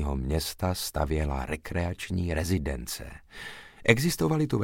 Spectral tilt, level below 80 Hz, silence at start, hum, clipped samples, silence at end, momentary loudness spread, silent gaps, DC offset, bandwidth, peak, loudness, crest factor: -5 dB/octave; -38 dBFS; 0 s; none; under 0.1%; 0 s; 17 LU; none; under 0.1%; 17 kHz; -4 dBFS; -29 LUFS; 24 dB